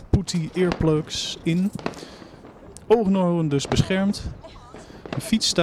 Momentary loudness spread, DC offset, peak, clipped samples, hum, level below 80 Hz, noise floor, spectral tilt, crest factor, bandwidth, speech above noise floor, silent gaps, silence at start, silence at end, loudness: 22 LU; under 0.1%; -4 dBFS; under 0.1%; none; -40 dBFS; -44 dBFS; -5.5 dB/octave; 20 dB; 14.5 kHz; 22 dB; none; 0 s; 0 s; -23 LUFS